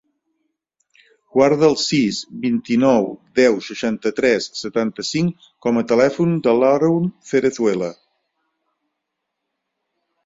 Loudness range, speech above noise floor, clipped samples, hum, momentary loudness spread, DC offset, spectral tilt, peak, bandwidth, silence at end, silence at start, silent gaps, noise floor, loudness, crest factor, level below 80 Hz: 3 LU; 61 dB; under 0.1%; none; 8 LU; under 0.1%; -5.5 dB/octave; -2 dBFS; 7.8 kHz; 2.35 s; 1.35 s; none; -78 dBFS; -18 LUFS; 18 dB; -60 dBFS